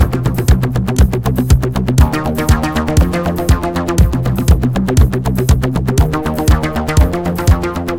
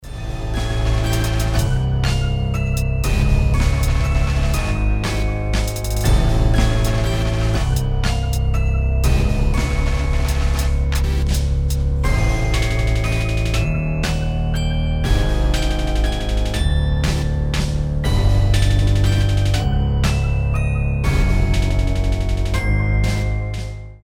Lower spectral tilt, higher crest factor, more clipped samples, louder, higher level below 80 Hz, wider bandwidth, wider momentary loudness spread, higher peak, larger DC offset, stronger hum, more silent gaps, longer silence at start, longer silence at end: about the same, -6.5 dB/octave vs -5.5 dB/octave; about the same, 12 dB vs 14 dB; first, 0.2% vs under 0.1%; first, -14 LUFS vs -20 LUFS; about the same, -16 dBFS vs -20 dBFS; about the same, 17 kHz vs 17 kHz; about the same, 3 LU vs 4 LU; about the same, 0 dBFS vs -2 dBFS; neither; neither; neither; about the same, 0 s vs 0 s; about the same, 0 s vs 0.05 s